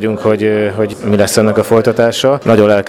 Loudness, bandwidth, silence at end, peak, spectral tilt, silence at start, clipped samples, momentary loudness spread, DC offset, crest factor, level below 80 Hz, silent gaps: -12 LUFS; 17 kHz; 0 s; 0 dBFS; -5.5 dB/octave; 0 s; 0.2%; 4 LU; under 0.1%; 12 dB; -46 dBFS; none